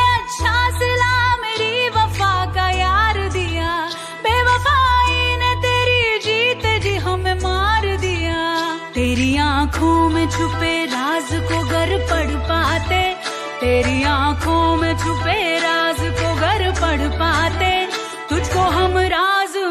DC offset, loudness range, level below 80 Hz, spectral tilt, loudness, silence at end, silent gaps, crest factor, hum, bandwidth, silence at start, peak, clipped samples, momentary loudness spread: under 0.1%; 2 LU; -28 dBFS; -4.5 dB/octave; -17 LUFS; 0 s; none; 14 dB; none; 14 kHz; 0 s; -4 dBFS; under 0.1%; 5 LU